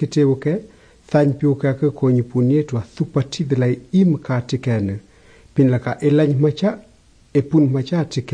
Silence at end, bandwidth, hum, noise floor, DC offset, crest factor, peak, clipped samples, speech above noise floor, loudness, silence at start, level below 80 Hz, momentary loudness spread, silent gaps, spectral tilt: 0 s; 9.6 kHz; none; -48 dBFS; under 0.1%; 14 dB; -4 dBFS; under 0.1%; 31 dB; -19 LUFS; 0 s; -54 dBFS; 7 LU; none; -8 dB/octave